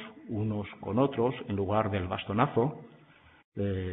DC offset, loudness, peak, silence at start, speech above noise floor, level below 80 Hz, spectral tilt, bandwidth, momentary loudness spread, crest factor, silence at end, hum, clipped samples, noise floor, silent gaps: under 0.1%; -31 LUFS; -10 dBFS; 0 s; 28 dB; -60 dBFS; -11 dB/octave; 4 kHz; 9 LU; 20 dB; 0 s; none; under 0.1%; -58 dBFS; 3.44-3.52 s